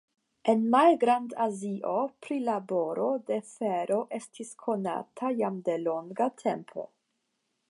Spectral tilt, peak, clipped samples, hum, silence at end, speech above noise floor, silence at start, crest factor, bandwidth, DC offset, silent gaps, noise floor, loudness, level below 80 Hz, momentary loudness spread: -6 dB/octave; -10 dBFS; under 0.1%; none; 0.85 s; 50 dB; 0.45 s; 20 dB; 11.5 kHz; under 0.1%; none; -79 dBFS; -29 LUFS; -84 dBFS; 14 LU